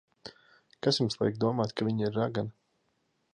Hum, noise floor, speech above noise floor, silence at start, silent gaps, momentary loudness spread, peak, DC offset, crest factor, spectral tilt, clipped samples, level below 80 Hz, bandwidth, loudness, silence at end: none; -75 dBFS; 46 dB; 0.25 s; none; 19 LU; -12 dBFS; under 0.1%; 20 dB; -6 dB/octave; under 0.1%; -66 dBFS; 10 kHz; -30 LUFS; 0.85 s